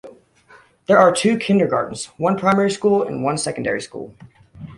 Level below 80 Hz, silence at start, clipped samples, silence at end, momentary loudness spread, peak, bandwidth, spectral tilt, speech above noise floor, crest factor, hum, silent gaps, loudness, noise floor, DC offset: -56 dBFS; 0.05 s; under 0.1%; 0.05 s; 16 LU; 0 dBFS; 11.5 kHz; -5 dB/octave; 32 dB; 18 dB; none; none; -18 LUFS; -50 dBFS; under 0.1%